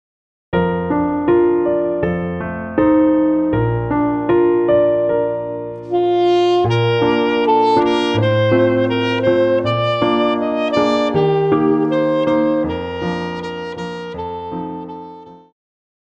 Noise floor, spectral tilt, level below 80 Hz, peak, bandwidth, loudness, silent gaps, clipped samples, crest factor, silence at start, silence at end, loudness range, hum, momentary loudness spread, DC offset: -37 dBFS; -7.5 dB/octave; -44 dBFS; -2 dBFS; 8 kHz; -16 LUFS; none; under 0.1%; 14 dB; 0.5 s; 0.65 s; 5 LU; none; 12 LU; under 0.1%